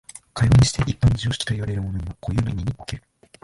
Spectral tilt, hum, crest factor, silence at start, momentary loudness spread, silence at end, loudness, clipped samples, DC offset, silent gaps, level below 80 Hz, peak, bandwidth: -5.5 dB/octave; none; 16 dB; 0.35 s; 17 LU; 0.45 s; -22 LUFS; under 0.1%; under 0.1%; none; -34 dBFS; -6 dBFS; 11.5 kHz